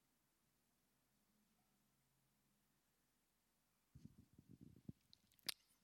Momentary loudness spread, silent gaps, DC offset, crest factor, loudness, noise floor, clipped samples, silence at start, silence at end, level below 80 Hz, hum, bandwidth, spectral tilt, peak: 17 LU; none; under 0.1%; 38 dB; -53 LUFS; -85 dBFS; under 0.1%; 3.95 s; 0.1 s; -86 dBFS; none; 17 kHz; -2 dB/octave; -26 dBFS